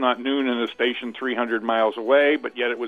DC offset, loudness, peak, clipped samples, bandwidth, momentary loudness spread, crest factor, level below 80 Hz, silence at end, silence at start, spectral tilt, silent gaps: under 0.1%; -22 LUFS; -6 dBFS; under 0.1%; 6.4 kHz; 7 LU; 16 dB; -72 dBFS; 0 s; 0 s; -5 dB/octave; none